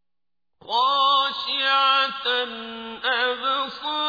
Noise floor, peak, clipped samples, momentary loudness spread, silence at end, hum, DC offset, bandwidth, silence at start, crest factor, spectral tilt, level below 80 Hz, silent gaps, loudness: -90 dBFS; -8 dBFS; under 0.1%; 10 LU; 0 s; none; under 0.1%; 5 kHz; 0.65 s; 16 dB; -2 dB/octave; -68 dBFS; none; -21 LUFS